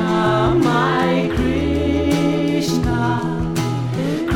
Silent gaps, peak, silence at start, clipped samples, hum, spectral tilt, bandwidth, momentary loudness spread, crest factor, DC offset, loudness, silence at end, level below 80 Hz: none; -4 dBFS; 0 s; under 0.1%; none; -6.5 dB/octave; 17 kHz; 5 LU; 14 dB; under 0.1%; -18 LUFS; 0 s; -32 dBFS